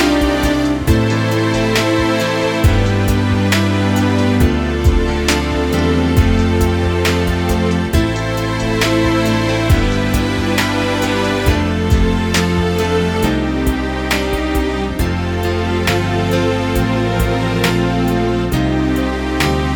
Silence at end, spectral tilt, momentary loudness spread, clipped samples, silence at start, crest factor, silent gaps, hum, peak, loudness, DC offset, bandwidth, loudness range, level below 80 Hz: 0 s; -5.5 dB/octave; 4 LU; under 0.1%; 0 s; 14 dB; none; none; 0 dBFS; -15 LUFS; under 0.1%; 18 kHz; 2 LU; -22 dBFS